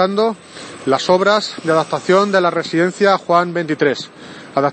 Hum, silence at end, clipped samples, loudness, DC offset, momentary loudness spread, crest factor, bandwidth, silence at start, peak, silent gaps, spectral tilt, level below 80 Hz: none; 0 s; under 0.1%; -16 LUFS; under 0.1%; 12 LU; 16 dB; 8.8 kHz; 0 s; 0 dBFS; none; -5 dB/octave; -64 dBFS